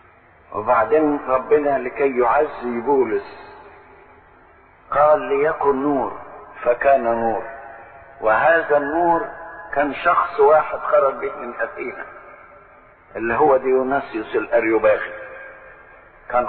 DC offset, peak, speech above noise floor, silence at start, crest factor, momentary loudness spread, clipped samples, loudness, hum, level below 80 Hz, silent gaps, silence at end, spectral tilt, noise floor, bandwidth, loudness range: under 0.1%; -4 dBFS; 32 dB; 0.5 s; 16 dB; 19 LU; under 0.1%; -19 LUFS; none; -52 dBFS; none; 0 s; -10.5 dB/octave; -50 dBFS; 4.5 kHz; 3 LU